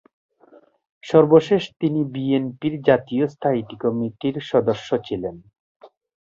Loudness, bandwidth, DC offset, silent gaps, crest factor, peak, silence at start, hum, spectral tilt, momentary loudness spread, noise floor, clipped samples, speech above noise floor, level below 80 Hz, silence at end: -21 LUFS; 7.4 kHz; under 0.1%; 5.60-5.80 s; 20 dB; -2 dBFS; 1.05 s; none; -7.5 dB/octave; 11 LU; -53 dBFS; under 0.1%; 33 dB; -58 dBFS; 0.45 s